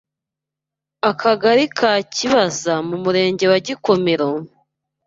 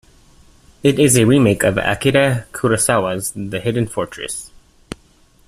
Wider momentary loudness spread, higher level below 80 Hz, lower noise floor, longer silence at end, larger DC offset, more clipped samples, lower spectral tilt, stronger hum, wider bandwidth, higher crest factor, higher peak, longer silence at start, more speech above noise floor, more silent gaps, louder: second, 6 LU vs 16 LU; second, -60 dBFS vs -44 dBFS; first, -85 dBFS vs -52 dBFS; second, 0.6 s vs 1 s; neither; neither; about the same, -4 dB/octave vs -4.5 dB/octave; neither; second, 7.8 kHz vs 15.5 kHz; about the same, 16 dB vs 16 dB; about the same, -2 dBFS vs -2 dBFS; first, 1.05 s vs 0.85 s; first, 68 dB vs 36 dB; neither; about the same, -17 LUFS vs -16 LUFS